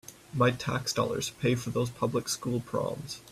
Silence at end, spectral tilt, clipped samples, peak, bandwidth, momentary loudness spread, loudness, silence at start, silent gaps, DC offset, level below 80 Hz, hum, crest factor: 0 s; -5 dB/octave; under 0.1%; -12 dBFS; 15 kHz; 6 LU; -30 LUFS; 0.1 s; none; under 0.1%; -60 dBFS; none; 18 dB